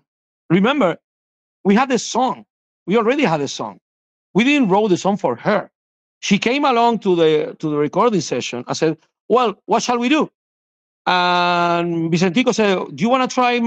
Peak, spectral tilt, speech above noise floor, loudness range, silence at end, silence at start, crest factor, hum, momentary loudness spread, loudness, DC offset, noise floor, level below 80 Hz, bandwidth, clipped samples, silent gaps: -4 dBFS; -5 dB/octave; over 73 dB; 2 LU; 0 s; 0.5 s; 14 dB; none; 8 LU; -17 LUFS; under 0.1%; under -90 dBFS; -62 dBFS; 8.6 kHz; under 0.1%; 1.04-1.64 s, 2.50-2.86 s, 3.81-4.34 s, 5.75-6.21 s, 9.20-9.29 s, 10.35-11.05 s